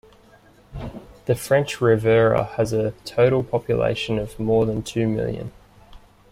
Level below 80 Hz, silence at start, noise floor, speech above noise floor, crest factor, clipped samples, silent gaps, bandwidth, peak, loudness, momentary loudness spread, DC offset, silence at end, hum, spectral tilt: -46 dBFS; 0.7 s; -52 dBFS; 32 dB; 16 dB; under 0.1%; none; 16 kHz; -6 dBFS; -21 LUFS; 18 LU; under 0.1%; 0.35 s; none; -6.5 dB/octave